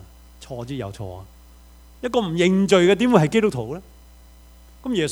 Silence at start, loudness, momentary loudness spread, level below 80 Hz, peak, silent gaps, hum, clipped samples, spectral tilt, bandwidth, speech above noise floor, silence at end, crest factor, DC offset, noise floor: 0.4 s; -20 LUFS; 20 LU; -48 dBFS; 0 dBFS; none; none; under 0.1%; -6 dB/octave; over 20 kHz; 27 dB; 0 s; 22 dB; under 0.1%; -47 dBFS